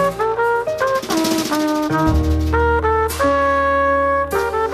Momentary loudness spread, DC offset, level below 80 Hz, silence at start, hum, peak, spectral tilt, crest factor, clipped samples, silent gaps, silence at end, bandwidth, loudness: 3 LU; under 0.1%; -28 dBFS; 0 s; none; -4 dBFS; -5.5 dB/octave; 14 dB; under 0.1%; none; 0 s; 14 kHz; -17 LUFS